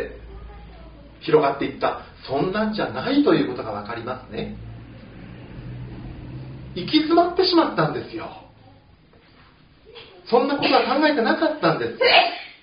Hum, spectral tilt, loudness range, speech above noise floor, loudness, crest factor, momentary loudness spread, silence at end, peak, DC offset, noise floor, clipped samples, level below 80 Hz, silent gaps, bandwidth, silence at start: none; -3 dB/octave; 6 LU; 32 dB; -20 LUFS; 22 dB; 22 LU; 0.1 s; -2 dBFS; under 0.1%; -52 dBFS; under 0.1%; -48 dBFS; none; 5.4 kHz; 0 s